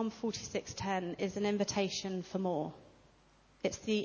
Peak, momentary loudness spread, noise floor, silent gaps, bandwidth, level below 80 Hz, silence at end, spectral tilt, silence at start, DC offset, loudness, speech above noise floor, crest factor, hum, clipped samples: -18 dBFS; 6 LU; -65 dBFS; none; 7.2 kHz; -64 dBFS; 0 s; -4.5 dB/octave; 0 s; under 0.1%; -37 LUFS; 30 dB; 18 dB; none; under 0.1%